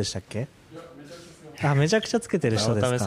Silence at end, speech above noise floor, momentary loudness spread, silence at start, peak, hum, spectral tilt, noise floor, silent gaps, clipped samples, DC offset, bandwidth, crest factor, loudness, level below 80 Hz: 0 s; 21 dB; 22 LU; 0 s; -10 dBFS; none; -5 dB/octave; -45 dBFS; none; under 0.1%; under 0.1%; 14.5 kHz; 16 dB; -25 LUFS; -58 dBFS